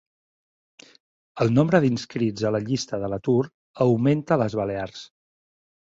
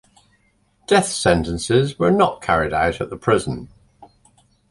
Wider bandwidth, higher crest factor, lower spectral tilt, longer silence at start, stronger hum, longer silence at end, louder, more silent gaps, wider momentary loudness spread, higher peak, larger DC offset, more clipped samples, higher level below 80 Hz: second, 7.8 kHz vs 11.5 kHz; about the same, 22 dB vs 18 dB; first, -7 dB/octave vs -5 dB/octave; first, 1.35 s vs 0.9 s; neither; first, 0.8 s vs 0.65 s; second, -23 LUFS vs -19 LUFS; first, 3.54-3.74 s vs none; first, 12 LU vs 8 LU; about the same, -2 dBFS vs -2 dBFS; neither; neither; second, -56 dBFS vs -40 dBFS